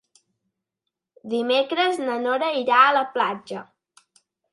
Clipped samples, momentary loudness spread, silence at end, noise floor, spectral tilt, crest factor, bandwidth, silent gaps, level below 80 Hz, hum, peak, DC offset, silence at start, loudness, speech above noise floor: under 0.1%; 15 LU; 0.9 s; -84 dBFS; -3.5 dB/octave; 22 dB; 11.5 kHz; none; -80 dBFS; none; -2 dBFS; under 0.1%; 1.25 s; -21 LUFS; 62 dB